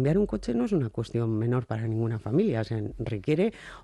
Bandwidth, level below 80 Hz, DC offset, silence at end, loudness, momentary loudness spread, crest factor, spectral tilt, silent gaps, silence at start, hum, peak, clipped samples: 10.5 kHz; -48 dBFS; under 0.1%; 0 s; -28 LUFS; 6 LU; 14 dB; -8.5 dB/octave; none; 0 s; none; -14 dBFS; under 0.1%